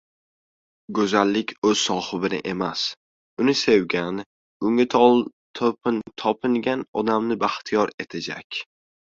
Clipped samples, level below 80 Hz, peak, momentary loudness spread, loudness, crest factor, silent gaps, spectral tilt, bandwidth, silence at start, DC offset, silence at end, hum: under 0.1%; -62 dBFS; -4 dBFS; 13 LU; -23 LUFS; 20 dB; 1.58-1.62 s, 2.97-3.37 s, 4.26-4.60 s, 5.33-5.54 s, 6.88-6.93 s, 7.94-7.98 s, 8.44-8.50 s; -4.5 dB/octave; 7.8 kHz; 0.9 s; under 0.1%; 0.55 s; none